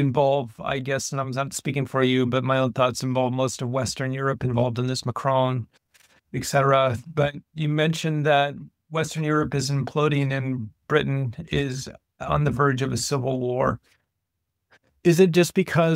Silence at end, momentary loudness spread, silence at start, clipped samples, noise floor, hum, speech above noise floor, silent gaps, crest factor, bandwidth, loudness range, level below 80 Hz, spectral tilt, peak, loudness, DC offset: 0 s; 8 LU; 0 s; under 0.1%; -80 dBFS; none; 57 dB; none; 20 dB; 16 kHz; 2 LU; -52 dBFS; -5.5 dB/octave; -4 dBFS; -24 LUFS; under 0.1%